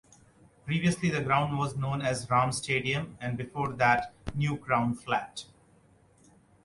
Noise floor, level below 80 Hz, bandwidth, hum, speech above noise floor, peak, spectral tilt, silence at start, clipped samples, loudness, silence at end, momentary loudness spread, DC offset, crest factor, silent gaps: -61 dBFS; -56 dBFS; 11.5 kHz; none; 33 dB; -10 dBFS; -5.5 dB/octave; 0.65 s; under 0.1%; -29 LUFS; 1.2 s; 10 LU; under 0.1%; 20 dB; none